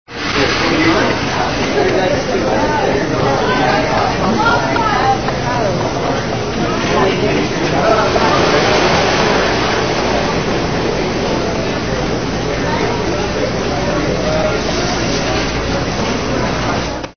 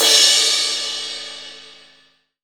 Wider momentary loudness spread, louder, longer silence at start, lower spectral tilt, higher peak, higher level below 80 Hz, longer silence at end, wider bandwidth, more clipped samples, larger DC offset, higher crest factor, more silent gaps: second, 5 LU vs 22 LU; about the same, -15 LUFS vs -14 LUFS; about the same, 0.05 s vs 0 s; first, -4.5 dB/octave vs 3 dB/octave; about the same, 0 dBFS vs 0 dBFS; first, -30 dBFS vs -66 dBFS; second, 0 s vs 0.75 s; second, 6.6 kHz vs over 20 kHz; neither; first, 2% vs under 0.1%; second, 14 dB vs 20 dB; neither